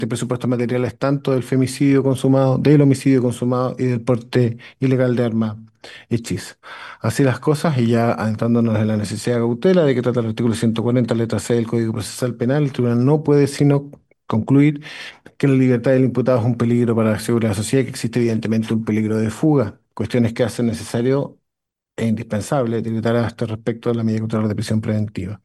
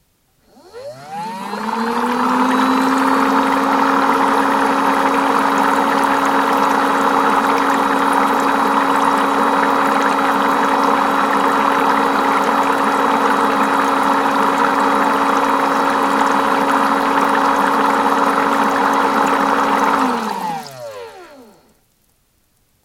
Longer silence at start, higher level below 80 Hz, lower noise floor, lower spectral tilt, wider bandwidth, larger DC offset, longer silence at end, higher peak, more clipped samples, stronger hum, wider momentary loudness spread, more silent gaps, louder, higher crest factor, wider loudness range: second, 0 s vs 0.75 s; about the same, -56 dBFS vs -54 dBFS; first, -82 dBFS vs -60 dBFS; first, -7 dB/octave vs -4 dB/octave; second, 12.5 kHz vs 17 kHz; neither; second, 0.1 s vs 1.45 s; about the same, -2 dBFS vs 0 dBFS; neither; neither; about the same, 8 LU vs 6 LU; neither; second, -19 LUFS vs -15 LUFS; about the same, 16 dB vs 16 dB; about the same, 5 LU vs 3 LU